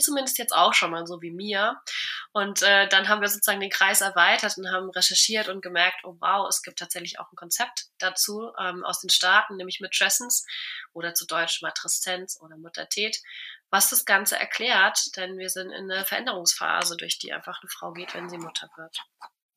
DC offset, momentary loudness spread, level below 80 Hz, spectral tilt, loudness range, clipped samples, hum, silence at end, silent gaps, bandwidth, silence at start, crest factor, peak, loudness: under 0.1%; 16 LU; under -90 dBFS; 0 dB/octave; 7 LU; under 0.1%; none; 0.3 s; none; 15.5 kHz; 0 s; 20 dB; -4 dBFS; -23 LUFS